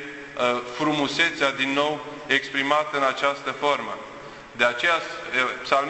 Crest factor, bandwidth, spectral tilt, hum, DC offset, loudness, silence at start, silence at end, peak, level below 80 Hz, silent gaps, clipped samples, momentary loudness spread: 22 dB; 8.4 kHz; -3 dB/octave; none; under 0.1%; -23 LUFS; 0 s; 0 s; -4 dBFS; -62 dBFS; none; under 0.1%; 12 LU